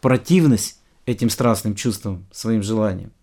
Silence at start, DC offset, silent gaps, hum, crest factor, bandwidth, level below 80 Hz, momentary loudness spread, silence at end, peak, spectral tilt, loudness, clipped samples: 0.05 s; under 0.1%; none; none; 18 dB; 18 kHz; -50 dBFS; 12 LU; 0.15 s; -2 dBFS; -6 dB/octave; -20 LUFS; under 0.1%